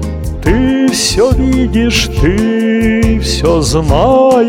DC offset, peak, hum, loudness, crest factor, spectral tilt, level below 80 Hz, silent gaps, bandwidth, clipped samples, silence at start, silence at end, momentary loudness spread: under 0.1%; 0 dBFS; none; -11 LUFS; 10 dB; -5 dB/octave; -18 dBFS; none; 17 kHz; under 0.1%; 0 s; 0 s; 3 LU